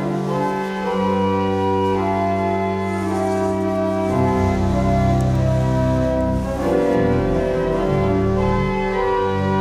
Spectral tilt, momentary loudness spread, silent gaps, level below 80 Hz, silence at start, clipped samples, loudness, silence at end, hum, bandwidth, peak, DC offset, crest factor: -8 dB/octave; 4 LU; none; -32 dBFS; 0 s; under 0.1%; -19 LUFS; 0 s; none; 13.5 kHz; -6 dBFS; under 0.1%; 14 dB